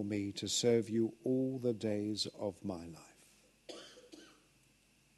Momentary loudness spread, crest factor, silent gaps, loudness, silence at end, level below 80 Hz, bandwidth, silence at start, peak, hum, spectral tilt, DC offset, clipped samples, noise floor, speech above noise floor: 23 LU; 18 dB; none; -36 LUFS; 0.9 s; -74 dBFS; 12.5 kHz; 0 s; -20 dBFS; none; -4.5 dB/octave; under 0.1%; under 0.1%; -70 dBFS; 34 dB